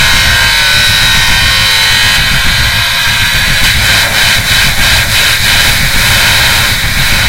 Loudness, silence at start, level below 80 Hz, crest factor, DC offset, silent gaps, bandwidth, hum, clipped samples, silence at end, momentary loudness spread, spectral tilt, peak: -6 LUFS; 0 s; -18 dBFS; 8 dB; under 0.1%; none; over 20 kHz; none; 2%; 0 s; 2 LU; -1.5 dB/octave; 0 dBFS